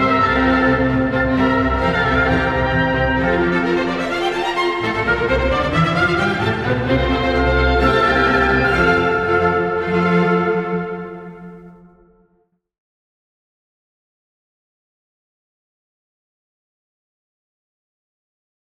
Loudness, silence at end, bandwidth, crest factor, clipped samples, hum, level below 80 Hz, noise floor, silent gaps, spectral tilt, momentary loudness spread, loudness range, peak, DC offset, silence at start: -16 LUFS; 6.95 s; 11.5 kHz; 18 dB; under 0.1%; none; -32 dBFS; -63 dBFS; none; -6.5 dB/octave; 5 LU; 6 LU; 0 dBFS; under 0.1%; 0 s